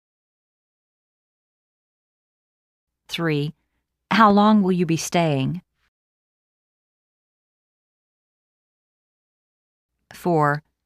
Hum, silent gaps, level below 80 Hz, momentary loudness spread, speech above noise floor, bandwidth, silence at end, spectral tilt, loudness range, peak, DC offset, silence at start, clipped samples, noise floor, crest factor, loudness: none; 5.88-9.89 s; -62 dBFS; 14 LU; over 71 dB; 15 kHz; 0.25 s; -6 dB/octave; 12 LU; -2 dBFS; under 0.1%; 3.1 s; under 0.1%; under -90 dBFS; 22 dB; -20 LUFS